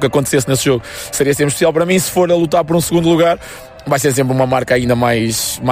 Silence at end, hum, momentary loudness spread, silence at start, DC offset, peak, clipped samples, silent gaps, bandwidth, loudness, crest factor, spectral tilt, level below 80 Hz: 0 s; none; 6 LU; 0 s; under 0.1%; -2 dBFS; under 0.1%; none; 16 kHz; -14 LUFS; 12 dB; -4.5 dB/octave; -40 dBFS